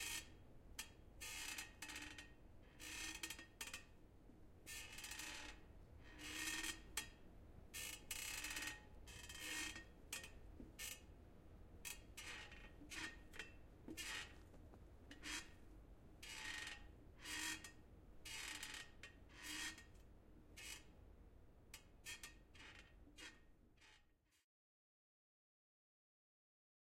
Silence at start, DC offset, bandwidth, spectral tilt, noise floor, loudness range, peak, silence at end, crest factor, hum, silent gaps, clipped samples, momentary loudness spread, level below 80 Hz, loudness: 0 s; under 0.1%; 16 kHz; -1 dB/octave; -76 dBFS; 11 LU; -30 dBFS; 2.6 s; 24 dB; none; none; under 0.1%; 19 LU; -66 dBFS; -52 LUFS